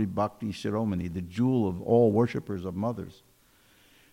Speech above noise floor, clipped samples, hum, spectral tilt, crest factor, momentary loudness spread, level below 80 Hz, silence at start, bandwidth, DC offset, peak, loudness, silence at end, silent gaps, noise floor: 34 dB; under 0.1%; none; -8.5 dB/octave; 16 dB; 12 LU; -62 dBFS; 0 s; 16 kHz; under 0.1%; -12 dBFS; -28 LUFS; 1 s; none; -62 dBFS